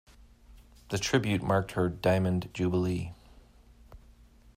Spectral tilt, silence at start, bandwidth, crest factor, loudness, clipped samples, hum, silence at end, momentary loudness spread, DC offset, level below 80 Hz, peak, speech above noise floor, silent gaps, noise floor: -6 dB/octave; 0.5 s; 15.5 kHz; 18 dB; -29 LUFS; under 0.1%; none; 0.6 s; 8 LU; under 0.1%; -54 dBFS; -12 dBFS; 28 dB; none; -56 dBFS